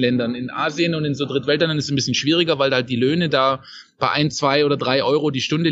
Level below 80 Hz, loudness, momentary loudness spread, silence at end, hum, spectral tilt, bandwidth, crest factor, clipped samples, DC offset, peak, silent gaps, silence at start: -58 dBFS; -19 LUFS; 5 LU; 0 s; none; -5 dB/octave; 8 kHz; 18 dB; under 0.1%; under 0.1%; -2 dBFS; none; 0 s